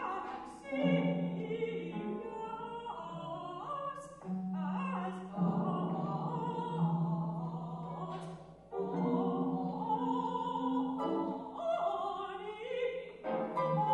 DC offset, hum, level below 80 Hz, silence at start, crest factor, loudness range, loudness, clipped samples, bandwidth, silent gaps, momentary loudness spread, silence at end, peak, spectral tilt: under 0.1%; none; -70 dBFS; 0 s; 18 dB; 5 LU; -37 LUFS; under 0.1%; 9.6 kHz; none; 9 LU; 0 s; -18 dBFS; -8.5 dB/octave